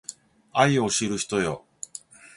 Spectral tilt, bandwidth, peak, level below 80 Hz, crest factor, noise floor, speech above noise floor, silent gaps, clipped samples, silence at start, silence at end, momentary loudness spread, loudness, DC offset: -4 dB/octave; 11.5 kHz; -6 dBFS; -58 dBFS; 22 dB; -46 dBFS; 22 dB; none; under 0.1%; 0.1 s; 0.8 s; 18 LU; -24 LUFS; under 0.1%